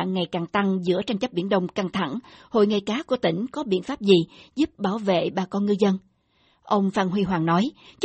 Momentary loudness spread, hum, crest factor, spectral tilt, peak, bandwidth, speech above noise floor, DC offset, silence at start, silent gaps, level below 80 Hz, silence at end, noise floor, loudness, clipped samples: 6 LU; none; 20 dB; -6.5 dB/octave; -4 dBFS; 8.4 kHz; 41 dB; under 0.1%; 0 s; none; -60 dBFS; 0 s; -64 dBFS; -24 LUFS; under 0.1%